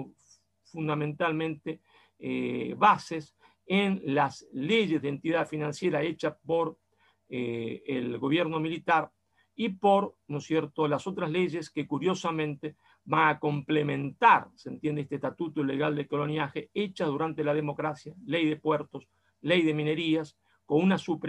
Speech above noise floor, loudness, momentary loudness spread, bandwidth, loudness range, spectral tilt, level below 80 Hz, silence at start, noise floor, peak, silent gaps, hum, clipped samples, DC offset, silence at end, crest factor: 36 dB; -29 LUFS; 12 LU; 11 kHz; 4 LU; -6.5 dB/octave; -72 dBFS; 0 s; -65 dBFS; -8 dBFS; none; none; under 0.1%; under 0.1%; 0 s; 20 dB